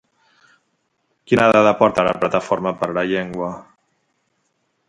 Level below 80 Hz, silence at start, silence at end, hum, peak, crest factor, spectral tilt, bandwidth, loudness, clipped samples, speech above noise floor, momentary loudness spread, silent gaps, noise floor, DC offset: -54 dBFS; 1.3 s; 1.25 s; none; 0 dBFS; 20 dB; -6 dB/octave; 11 kHz; -18 LUFS; under 0.1%; 52 dB; 13 LU; none; -69 dBFS; under 0.1%